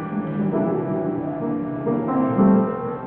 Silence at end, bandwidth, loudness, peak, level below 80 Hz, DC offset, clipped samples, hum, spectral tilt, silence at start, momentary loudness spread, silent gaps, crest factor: 0 s; 3.5 kHz; -22 LUFS; -6 dBFS; -52 dBFS; under 0.1%; under 0.1%; none; -13.5 dB/octave; 0 s; 9 LU; none; 14 dB